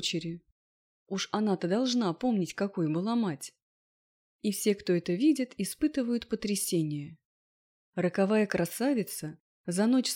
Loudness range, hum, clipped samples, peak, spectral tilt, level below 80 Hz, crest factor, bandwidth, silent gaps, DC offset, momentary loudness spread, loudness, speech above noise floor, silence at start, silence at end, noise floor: 1 LU; none; under 0.1%; -14 dBFS; -5 dB/octave; -66 dBFS; 16 dB; 17.5 kHz; 0.52-1.06 s, 3.62-4.39 s, 7.25-7.93 s, 9.40-9.64 s; under 0.1%; 13 LU; -30 LUFS; over 61 dB; 0 s; 0 s; under -90 dBFS